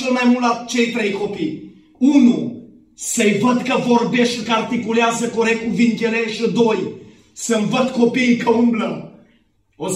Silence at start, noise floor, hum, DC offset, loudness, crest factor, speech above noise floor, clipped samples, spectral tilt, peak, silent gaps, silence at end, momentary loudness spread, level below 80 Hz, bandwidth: 0 s; -59 dBFS; none; under 0.1%; -17 LUFS; 16 dB; 42 dB; under 0.1%; -4.5 dB/octave; -2 dBFS; none; 0 s; 10 LU; -60 dBFS; 13.5 kHz